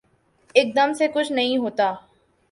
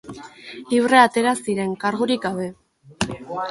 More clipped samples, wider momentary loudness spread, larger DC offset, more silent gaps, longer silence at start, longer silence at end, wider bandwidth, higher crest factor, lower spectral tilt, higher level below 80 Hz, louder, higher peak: neither; second, 5 LU vs 23 LU; neither; neither; first, 0.55 s vs 0.05 s; first, 0.5 s vs 0 s; about the same, 11.5 kHz vs 11.5 kHz; about the same, 20 dB vs 18 dB; about the same, -3.5 dB/octave vs -4.5 dB/octave; second, -68 dBFS vs -54 dBFS; about the same, -21 LUFS vs -20 LUFS; about the same, -2 dBFS vs -2 dBFS